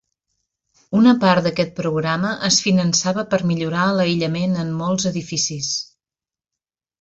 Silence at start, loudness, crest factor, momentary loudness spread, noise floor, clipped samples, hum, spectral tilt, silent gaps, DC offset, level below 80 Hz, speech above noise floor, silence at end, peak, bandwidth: 0.9 s; -19 LUFS; 18 dB; 7 LU; under -90 dBFS; under 0.1%; none; -4.5 dB/octave; none; under 0.1%; -56 dBFS; over 72 dB; 1.2 s; -2 dBFS; 8 kHz